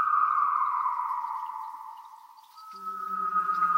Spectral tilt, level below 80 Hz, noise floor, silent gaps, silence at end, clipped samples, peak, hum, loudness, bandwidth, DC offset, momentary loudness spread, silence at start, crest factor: -3.5 dB/octave; under -90 dBFS; -51 dBFS; none; 0 s; under 0.1%; -14 dBFS; none; -28 LUFS; 16 kHz; under 0.1%; 21 LU; 0 s; 16 dB